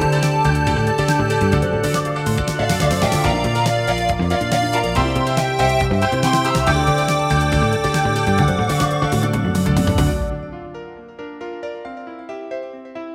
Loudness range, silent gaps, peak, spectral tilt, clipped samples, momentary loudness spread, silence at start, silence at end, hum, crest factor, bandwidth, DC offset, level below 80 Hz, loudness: 5 LU; none; -4 dBFS; -5.5 dB/octave; under 0.1%; 16 LU; 0 s; 0 s; none; 14 dB; 16.5 kHz; under 0.1%; -30 dBFS; -18 LUFS